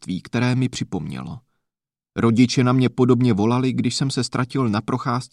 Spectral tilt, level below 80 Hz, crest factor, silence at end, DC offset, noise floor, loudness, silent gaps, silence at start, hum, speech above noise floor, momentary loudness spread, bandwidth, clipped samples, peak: -6 dB/octave; -54 dBFS; 16 dB; 0.05 s; under 0.1%; -86 dBFS; -20 LUFS; none; 0 s; none; 66 dB; 13 LU; 11 kHz; under 0.1%; -4 dBFS